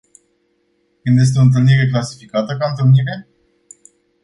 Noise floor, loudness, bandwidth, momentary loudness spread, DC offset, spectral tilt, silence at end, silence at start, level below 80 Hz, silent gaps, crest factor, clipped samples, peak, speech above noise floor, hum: -63 dBFS; -15 LUFS; 11 kHz; 12 LU; under 0.1%; -7 dB/octave; 1 s; 1.05 s; -52 dBFS; none; 14 dB; under 0.1%; -2 dBFS; 49 dB; none